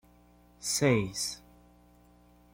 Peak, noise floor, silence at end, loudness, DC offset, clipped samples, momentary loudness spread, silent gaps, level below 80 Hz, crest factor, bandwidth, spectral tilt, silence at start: -12 dBFS; -60 dBFS; 1.15 s; -30 LUFS; under 0.1%; under 0.1%; 12 LU; none; -60 dBFS; 22 dB; 16.5 kHz; -4 dB/octave; 0.6 s